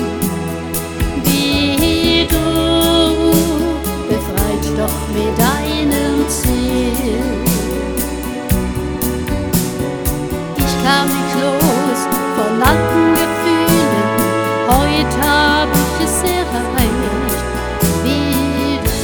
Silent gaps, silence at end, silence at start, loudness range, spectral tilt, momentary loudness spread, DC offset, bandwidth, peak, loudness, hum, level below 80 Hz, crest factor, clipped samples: none; 0 s; 0 s; 4 LU; -4.5 dB/octave; 7 LU; 0.2%; over 20 kHz; 0 dBFS; -15 LUFS; none; -26 dBFS; 14 dB; under 0.1%